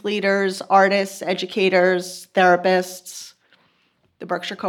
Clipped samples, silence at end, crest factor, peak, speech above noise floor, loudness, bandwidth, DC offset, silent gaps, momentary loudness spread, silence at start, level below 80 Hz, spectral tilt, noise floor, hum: under 0.1%; 0 s; 18 dB; -4 dBFS; 45 dB; -19 LUFS; 18.5 kHz; under 0.1%; none; 17 LU; 0.05 s; -78 dBFS; -4.5 dB/octave; -64 dBFS; none